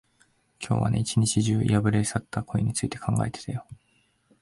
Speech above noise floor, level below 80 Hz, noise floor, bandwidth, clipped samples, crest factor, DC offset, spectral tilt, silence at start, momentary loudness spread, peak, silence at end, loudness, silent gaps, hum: 42 dB; -48 dBFS; -67 dBFS; 11.5 kHz; under 0.1%; 18 dB; under 0.1%; -5.5 dB/octave; 0.6 s; 11 LU; -10 dBFS; 0.7 s; -26 LUFS; none; none